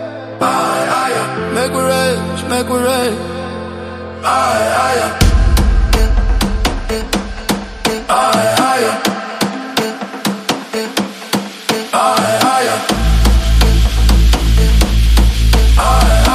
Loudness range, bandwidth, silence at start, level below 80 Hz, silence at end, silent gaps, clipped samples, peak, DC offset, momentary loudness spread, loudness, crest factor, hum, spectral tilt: 4 LU; 15.5 kHz; 0 s; -16 dBFS; 0 s; none; under 0.1%; 0 dBFS; under 0.1%; 8 LU; -14 LUFS; 12 dB; none; -4.5 dB/octave